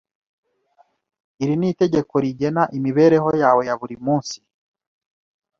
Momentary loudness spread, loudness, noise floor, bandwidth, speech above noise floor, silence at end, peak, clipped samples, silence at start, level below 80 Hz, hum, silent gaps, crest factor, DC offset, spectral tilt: 11 LU; -19 LUFS; -60 dBFS; 7.4 kHz; 42 dB; 1.25 s; -2 dBFS; under 0.1%; 1.4 s; -60 dBFS; none; none; 18 dB; under 0.1%; -7 dB/octave